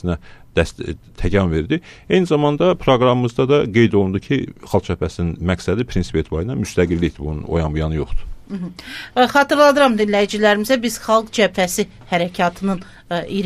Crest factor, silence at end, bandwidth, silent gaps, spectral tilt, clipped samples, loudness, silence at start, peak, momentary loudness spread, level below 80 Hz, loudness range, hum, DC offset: 16 dB; 0 s; 15 kHz; none; -5.5 dB/octave; under 0.1%; -18 LUFS; 0.05 s; -2 dBFS; 11 LU; -34 dBFS; 5 LU; none; under 0.1%